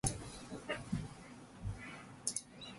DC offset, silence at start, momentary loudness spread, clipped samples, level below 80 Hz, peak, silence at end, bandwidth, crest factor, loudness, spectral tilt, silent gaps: under 0.1%; 0.05 s; 10 LU; under 0.1%; -56 dBFS; -16 dBFS; 0 s; 12 kHz; 28 dB; -44 LUFS; -3.5 dB/octave; none